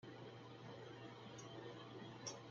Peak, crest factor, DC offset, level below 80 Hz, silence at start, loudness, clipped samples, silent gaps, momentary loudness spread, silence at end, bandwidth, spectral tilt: -36 dBFS; 20 dB; under 0.1%; -84 dBFS; 0 s; -55 LUFS; under 0.1%; none; 5 LU; 0 s; 7.8 kHz; -4 dB/octave